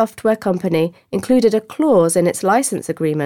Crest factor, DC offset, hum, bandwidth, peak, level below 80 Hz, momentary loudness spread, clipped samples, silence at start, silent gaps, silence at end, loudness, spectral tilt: 14 dB; under 0.1%; none; 18 kHz; -4 dBFS; -56 dBFS; 7 LU; under 0.1%; 0 s; none; 0 s; -17 LUFS; -5.5 dB/octave